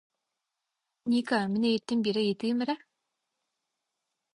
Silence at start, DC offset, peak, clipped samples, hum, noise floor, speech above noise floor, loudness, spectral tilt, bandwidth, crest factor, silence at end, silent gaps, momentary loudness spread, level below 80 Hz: 1.05 s; under 0.1%; -14 dBFS; under 0.1%; none; -85 dBFS; 57 dB; -29 LUFS; -6 dB/octave; 11 kHz; 18 dB; 1.6 s; none; 7 LU; -74 dBFS